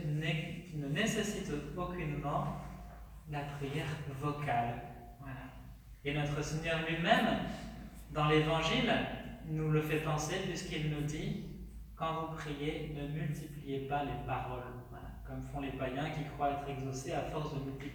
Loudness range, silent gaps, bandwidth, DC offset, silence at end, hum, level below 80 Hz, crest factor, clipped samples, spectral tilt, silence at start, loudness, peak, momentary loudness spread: 7 LU; none; over 20 kHz; under 0.1%; 0 s; none; -52 dBFS; 22 dB; under 0.1%; -5.5 dB/octave; 0 s; -36 LUFS; -14 dBFS; 17 LU